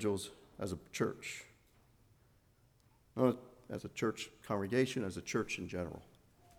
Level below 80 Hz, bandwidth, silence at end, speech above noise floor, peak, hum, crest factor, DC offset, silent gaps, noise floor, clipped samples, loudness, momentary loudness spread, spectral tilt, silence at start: -66 dBFS; 18.5 kHz; 0.55 s; 32 dB; -16 dBFS; none; 22 dB; under 0.1%; none; -69 dBFS; under 0.1%; -39 LUFS; 14 LU; -5 dB/octave; 0 s